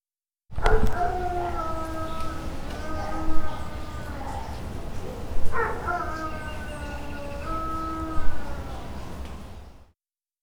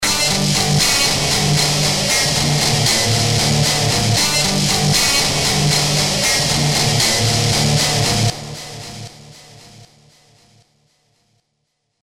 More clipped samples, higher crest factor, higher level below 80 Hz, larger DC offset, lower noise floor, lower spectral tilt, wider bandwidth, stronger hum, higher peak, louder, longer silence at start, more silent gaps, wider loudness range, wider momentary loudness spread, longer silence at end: neither; about the same, 18 dB vs 16 dB; first, -32 dBFS vs -38 dBFS; second, under 0.1% vs 0.6%; first, -84 dBFS vs -71 dBFS; first, -6 dB/octave vs -3 dB/octave; second, 11 kHz vs 16.5 kHz; neither; second, -6 dBFS vs -2 dBFS; second, -32 LUFS vs -14 LUFS; first, 0.5 s vs 0 s; neither; about the same, 5 LU vs 6 LU; first, 11 LU vs 5 LU; second, 0.65 s vs 2.2 s